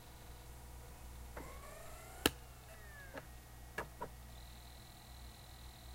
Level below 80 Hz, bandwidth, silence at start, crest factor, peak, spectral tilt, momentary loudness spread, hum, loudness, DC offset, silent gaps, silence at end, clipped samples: -56 dBFS; 16 kHz; 0 s; 40 dB; -8 dBFS; -3 dB/octave; 18 LU; none; -48 LUFS; under 0.1%; none; 0 s; under 0.1%